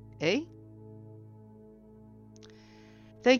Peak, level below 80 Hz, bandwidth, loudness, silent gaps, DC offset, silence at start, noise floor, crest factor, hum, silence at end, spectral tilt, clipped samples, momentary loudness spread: -10 dBFS; -66 dBFS; 7 kHz; -31 LUFS; none; under 0.1%; 0.2 s; -54 dBFS; 24 dB; none; 0 s; -4.5 dB/octave; under 0.1%; 24 LU